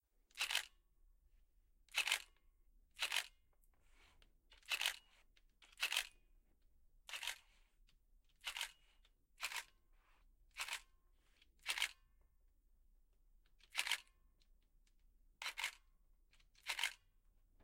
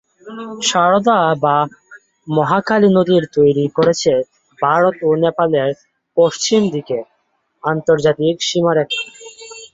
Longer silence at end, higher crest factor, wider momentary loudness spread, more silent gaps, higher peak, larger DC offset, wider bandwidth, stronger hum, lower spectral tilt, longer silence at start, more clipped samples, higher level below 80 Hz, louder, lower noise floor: first, 0.7 s vs 0.05 s; first, 30 dB vs 14 dB; first, 17 LU vs 13 LU; neither; second, -20 dBFS vs 0 dBFS; neither; first, 16.5 kHz vs 7.8 kHz; neither; second, 3 dB/octave vs -5 dB/octave; about the same, 0.35 s vs 0.25 s; neither; second, -72 dBFS vs -56 dBFS; second, -43 LUFS vs -15 LUFS; first, -73 dBFS vs -65 dBFS